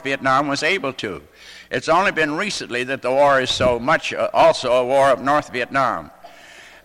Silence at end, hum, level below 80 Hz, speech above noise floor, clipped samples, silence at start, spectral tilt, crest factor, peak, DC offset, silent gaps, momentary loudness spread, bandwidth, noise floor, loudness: 0.15 s; none; -48 dBFS; 25 dB; under 0.1%; 0 s; -4 dB/octave; 14 dB; -6 dBFS; under 0.1%; none; 10 LU; 14.5 kHz; -43 dBFS; -18 LUFS